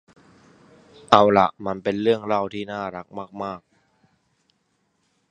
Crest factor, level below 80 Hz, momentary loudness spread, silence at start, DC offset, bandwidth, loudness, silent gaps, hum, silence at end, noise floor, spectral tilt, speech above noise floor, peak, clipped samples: 24 dB; -60 dBFS; 18 LU; 1.1 s; under 0.1%; 9.4 kHz; -21 LUFS; none; none; 1.7 s; -70 dBFS; -6 dB/octave; 49 dB; 0 dBFS; under 0.1%